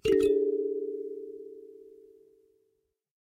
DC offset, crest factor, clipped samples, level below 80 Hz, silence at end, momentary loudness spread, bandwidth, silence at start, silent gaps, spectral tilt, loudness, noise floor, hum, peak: under 0.1%; 18 dB; under 0.1%; -60 dBFS; 1.35 s; 23 LU; 11.5 kHz; 0.05 s; none; -6 dB/octave; -29 LUFS; -77 dBFS; none; -14 dBFS